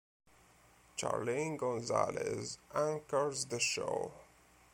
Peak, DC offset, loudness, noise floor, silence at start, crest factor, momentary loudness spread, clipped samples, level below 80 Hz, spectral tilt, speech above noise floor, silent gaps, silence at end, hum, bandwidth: -16 dBFS; under 0.1%; -36 LUFS; -65 dBFS; 0.95 s; 22 dB; 7 LU; under 0.1%; -72 dBFS; -3.5 dB/octave; 28 dB; none; 0.5 s; none; 16.5 kHz